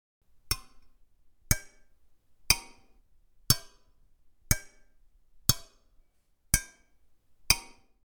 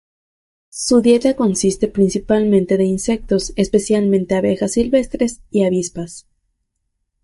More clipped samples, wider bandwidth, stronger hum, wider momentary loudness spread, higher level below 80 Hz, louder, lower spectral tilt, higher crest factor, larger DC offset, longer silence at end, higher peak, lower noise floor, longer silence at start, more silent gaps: neither; first, 19 kHz vs 11.5 kHz; neither; about the same, 7 LU vs 7 LU; about the same, -44 dBFS vs -42 dBFS; second, -29 LUFS vs -17 LUFS; second, -1.5 dB/octave vs -5.5 dB/octave; first, 32 dB vs 14 dB; neither; second, 0.55 s vs 1.05 s; about the same, -4 dBFS vs -2 dBFS; second, -67 dBFS vs -72 dBFS; second, 0.5 s vs 0.75 s; neither